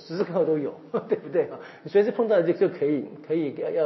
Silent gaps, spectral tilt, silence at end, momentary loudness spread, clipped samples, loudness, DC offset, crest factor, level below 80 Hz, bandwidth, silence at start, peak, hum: none; -6.5 dB/octave; 0 s; 8 LU; under 0.1%; -25 LUFS; under 0.1%; 16 dB; -82 dBFS; 6 kHz; 0 s; -10 dBFS; none